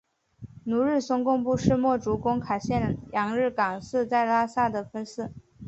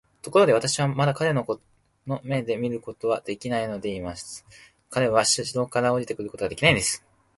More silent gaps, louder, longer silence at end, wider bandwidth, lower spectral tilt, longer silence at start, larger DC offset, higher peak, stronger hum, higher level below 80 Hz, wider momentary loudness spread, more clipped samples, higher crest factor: neither; about the same, -26 LUFS vs -24 LUFS; second, 0 s vs 0.4 s; second, 8.2 kHz vs 12 kHz; first, -7 dB/octave vs -4 dB/octave; first, 0.4 s vs 0.25 s; neither; about the same, -6 dBFS vs -4 dBFS; neither; about the same, -50 dBFS vs -54 dBFS; about the same, 11 LU vs 13 LU; neither; about the same, 20 dB vs 22 dB